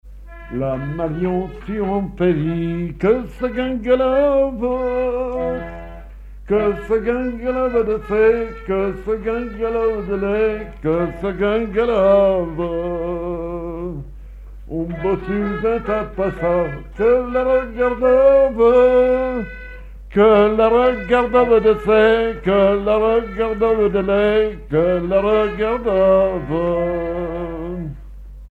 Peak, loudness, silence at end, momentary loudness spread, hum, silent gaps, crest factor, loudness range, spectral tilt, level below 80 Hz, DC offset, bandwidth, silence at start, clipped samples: -2 dBFS; -18 LUFS; 0.05 s; 12 LU; none; none; 14 dB; 6 LU; -8.5 dB/octave; -36 dBFS; under 0.1%; 4.9 kHz; 0.05 s; under 0.1%